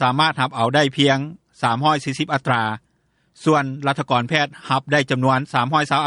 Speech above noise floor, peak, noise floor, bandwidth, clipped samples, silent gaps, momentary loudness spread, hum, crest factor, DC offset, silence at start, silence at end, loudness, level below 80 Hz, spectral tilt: 45 dB; -2 dBFS; -64 dBFS; 11.5 kHz; under 0.1%; none; 6 LU; none; 18 dB; under 0.1%; 0 s; 0 s; -19 LUFS; -62 dBFS; -5.5 dB/octave